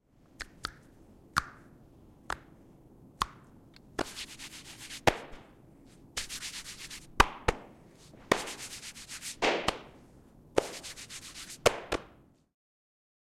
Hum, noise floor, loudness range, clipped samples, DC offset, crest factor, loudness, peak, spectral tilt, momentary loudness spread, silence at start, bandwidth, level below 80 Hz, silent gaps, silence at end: none; -59 dBFS; 8 LU; under 0.1%; under 0.1%; 32 dB; -34 LUFS; -4 dBFS; -3 dB/octave; 17 LU; 0.4 s; 16.5 kHz; -50 dBFS; none; 1.15 s